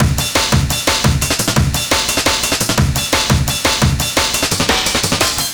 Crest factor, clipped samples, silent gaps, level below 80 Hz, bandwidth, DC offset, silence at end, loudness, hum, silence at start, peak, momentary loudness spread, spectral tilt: 14 dB; under 0.1%; none; -26 dBFS; over 20 kHz; under 0.1%; 0 s; -14 LUFS; none; 0 s; 0 dBFS; 1 LU; -3 dB/octave